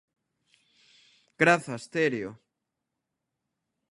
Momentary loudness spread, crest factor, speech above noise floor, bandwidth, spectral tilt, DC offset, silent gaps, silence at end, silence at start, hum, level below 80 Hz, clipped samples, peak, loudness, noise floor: 13 LU; 26 dB; 58 dB; 11.5 kHz; -5 dB/octave; under 0.1%; none; 1.55 s; 1.4 s; none; -74 dBFS; under 0.1%; -6 dBFS; -26 LUFS; -84 dBFS